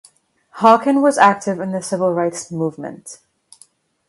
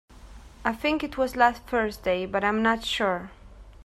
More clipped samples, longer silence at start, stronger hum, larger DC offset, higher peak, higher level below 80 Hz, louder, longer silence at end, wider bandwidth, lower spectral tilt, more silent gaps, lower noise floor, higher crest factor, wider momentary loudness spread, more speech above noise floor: neither; first, 0.55 s vs 0.15 s; neither; neither; first, 0 dBFS vs -6 dBFS; second, -68 dBFS vs -48 dBFS; first, -16 LUFS vs -26 LUFS; first, 0.95 s vs 0 s; second, 11.5 kHz vs 15 kHz; about the same, -5 dB/octave vs -4.5 dB/octave; neither; first, -53 dBFS vs -46 dBFS; about the same, 18 dB vs 22 dB; first, 19 LU vs 9 LU; first, 37 dB vs 21 dB